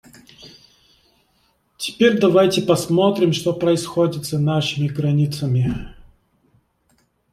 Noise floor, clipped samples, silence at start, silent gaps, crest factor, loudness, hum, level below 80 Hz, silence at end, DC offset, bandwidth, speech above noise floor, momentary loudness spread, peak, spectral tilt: -63 dBFS; under 0.1%; 0.4 s; none; 18 dB; -19 LUFS; none; -48 dBFS; 1.4 s; under 0.1%; 15.5 kHz; 45 dB; 7 LU; -2 dBFS; -6 dB/octave